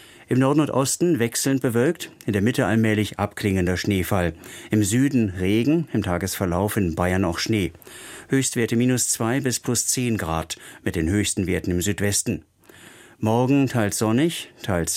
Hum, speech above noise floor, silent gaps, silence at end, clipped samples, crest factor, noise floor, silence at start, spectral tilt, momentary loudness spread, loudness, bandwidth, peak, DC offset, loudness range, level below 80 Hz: none; 26 dB; none; 0 s; under 0.1%; 16 dB; -48 dBFS; 0.2 s; -5 dB/octave; 8 LU; -22 LUFS; 16.5 kHz; -6 dBFS; under 0.1%; 2 LU; -46 dBFS